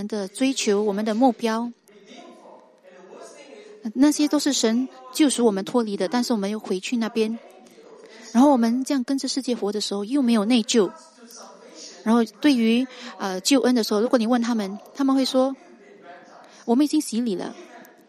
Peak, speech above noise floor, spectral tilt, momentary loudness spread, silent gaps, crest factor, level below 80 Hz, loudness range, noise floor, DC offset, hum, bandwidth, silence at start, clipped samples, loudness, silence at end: -6 dBFS; 28 dB; -4 dB/octave; 16 LU; none; 18 dB; -74 dBFS; 4 LU; -49 dBFS; under 0.1%; none; 15 kHz; 0 s; under 0.1%; -22 LUFS; 0.25 s